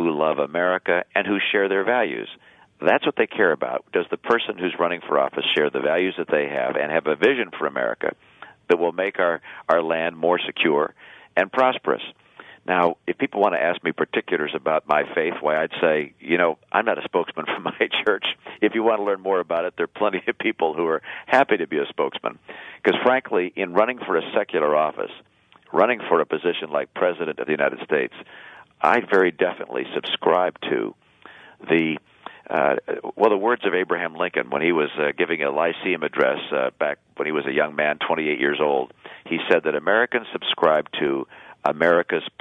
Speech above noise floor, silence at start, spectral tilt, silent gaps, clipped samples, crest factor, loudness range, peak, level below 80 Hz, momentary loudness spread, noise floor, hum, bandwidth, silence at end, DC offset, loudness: 25 dB; 0 s; -6.5 dB/octave; none; under 0.1%; 22 dB; 2 LU; -2 dBFS; -70 dBFS; 7 LU; -47 dBFS; none; 7 kHz; 0.15 s; under 0.1%; -22 LUFS